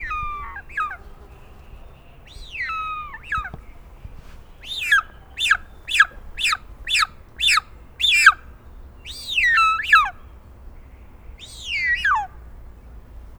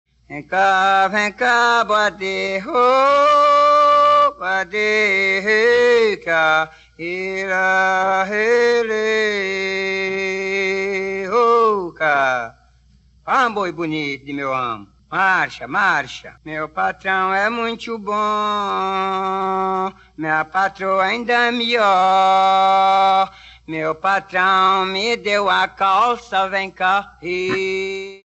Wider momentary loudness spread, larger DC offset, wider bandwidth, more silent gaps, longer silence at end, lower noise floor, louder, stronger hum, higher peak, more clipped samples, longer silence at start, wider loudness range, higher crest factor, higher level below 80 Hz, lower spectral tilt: first, 20 LU vs 10 LU; neither; first, over 20 kHz vs 8.2 kHz; neither; about the same, 0.05 s vs 0.1 s; second, -44 dBFS vs -53 dBFS; about the same, -19 LUFS vs -17 LUFS; neither; first, 0 dBFS vs -4 dBFS; neither; second, 0 s vs 0.3 s; first, 13 LU vs 6 LU; first, 24 dB vs 14 dB; first, -42 dBFS vs -56 dBFS; second, 0.5 dB/octave vs -3.5 dB/octave